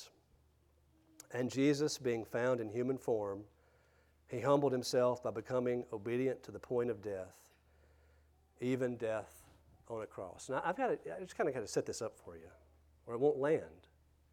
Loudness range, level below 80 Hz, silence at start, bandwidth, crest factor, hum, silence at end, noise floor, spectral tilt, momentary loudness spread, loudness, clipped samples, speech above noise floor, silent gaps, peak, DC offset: 5 LU; -72 dBFS; 0 s; 17 kHz; 22 dB; none; 0.55 s; -71 dBFS; -5.5 dB/octave; 14 LU; -37 LUFS; under 0.1%; 34 dB; none; -18 dBFS; under 0.1%